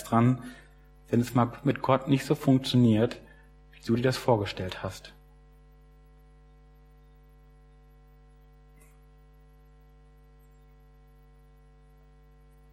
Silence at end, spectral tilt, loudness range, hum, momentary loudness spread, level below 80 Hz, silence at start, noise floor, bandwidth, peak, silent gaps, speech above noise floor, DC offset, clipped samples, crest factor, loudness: 7.6 s; -7 dB/octave; 11 LU; none; 18 LU; -56 dBFS; 0 s; -55 dBFS; 16 kHz; -8 dBFS; none; 30 dB; under 0.1%; under 0.1%; 22 dB; -27 LUFS